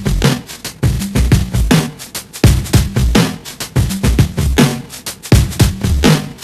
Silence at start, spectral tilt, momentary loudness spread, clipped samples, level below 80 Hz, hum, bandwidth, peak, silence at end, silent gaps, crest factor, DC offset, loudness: 0 s; -5.5 dB/octave; 11 LU; 0.3%; -20 dBFS; none; 15 kHz; 0 dBFS; 0 s; none; 14 dB; under 0.1%; -14 LUFS